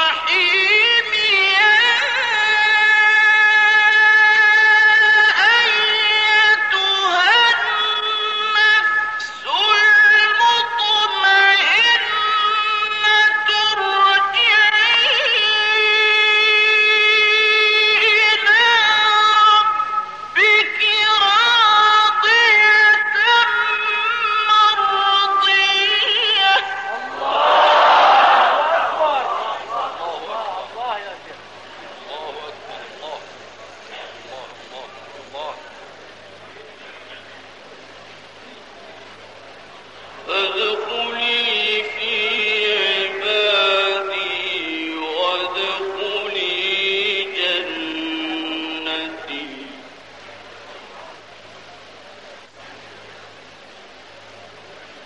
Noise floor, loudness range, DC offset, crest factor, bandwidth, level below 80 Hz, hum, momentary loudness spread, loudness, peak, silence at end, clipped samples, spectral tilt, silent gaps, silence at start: -42 dBFS; 18 LU; 0.2%; 14 dB; 9.2 kHz; -66 dBFS; none; 15 LU; -14 LUFS; -2 dBFS; 0 s; under 0.1%; -0.5 dB/octave; none; 0 s